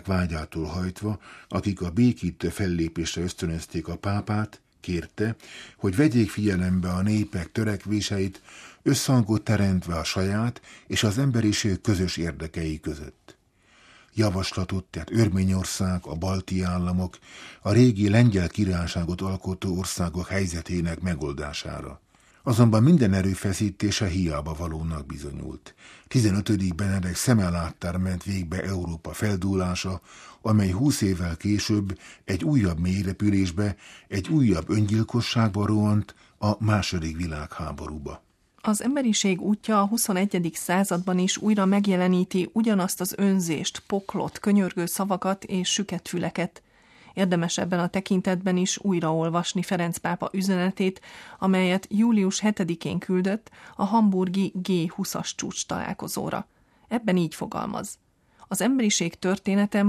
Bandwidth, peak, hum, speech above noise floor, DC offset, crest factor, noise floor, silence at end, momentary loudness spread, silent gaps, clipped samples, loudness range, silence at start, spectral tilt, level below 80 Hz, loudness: 14.5 kHz; -4 dBFS; none; 35 dB; under 0.1%; 20 dB; -59 dBFS; 0 s; 11 LU; none; under 0.1%; 4 LU; 0.05 s; -5.5 dB/octave; -46 dBFS; -25 LUFS